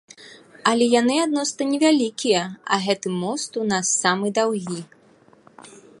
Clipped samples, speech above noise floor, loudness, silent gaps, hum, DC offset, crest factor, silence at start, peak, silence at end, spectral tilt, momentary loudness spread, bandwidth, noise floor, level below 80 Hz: under 0.1%; 33 dB; -21 LUFS; none; none; under 0.1%; 22 dB; 0.2 s; -2 dBFS; 0.3 s; -3.5 dB/octave; 8 LU; 11.5 kHz; -54 dBFS; -70 dBFS